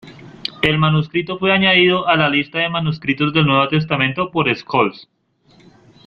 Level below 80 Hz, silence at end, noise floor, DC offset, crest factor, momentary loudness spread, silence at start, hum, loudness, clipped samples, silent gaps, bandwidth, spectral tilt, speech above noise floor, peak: -50 dBFS; 1.05 s; -53 dBFS; under 0.1%; 16 dB; 8 LU; 0.05 s; none; -16 LUFS; under 0.1%; none; 6 kHz; -7.5 dB/octave; 37 dB; 0 dBFS